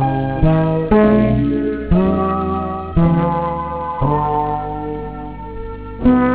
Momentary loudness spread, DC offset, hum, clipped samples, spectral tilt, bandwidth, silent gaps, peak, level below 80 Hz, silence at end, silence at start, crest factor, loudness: 15 LU; 0.6%; none; under 0.1%; -12.5 dB/octave; 4 kHz; none; 0 dBFS; -28 dBFS; 0 s; 0 s; 16 dB; -17 LUFS